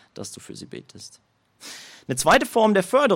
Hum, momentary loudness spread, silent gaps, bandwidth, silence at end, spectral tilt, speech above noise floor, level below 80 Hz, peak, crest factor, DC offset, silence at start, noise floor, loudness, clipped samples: none; 24 LU; none; 16.5 kHz; 0 s; -4 dB/octave; 22 dB; -56 dBFS; -6 dBFS; 18 dB; under 0.1%; 0.2 s; -43 dBFS; -19 LUFS; under 0.1%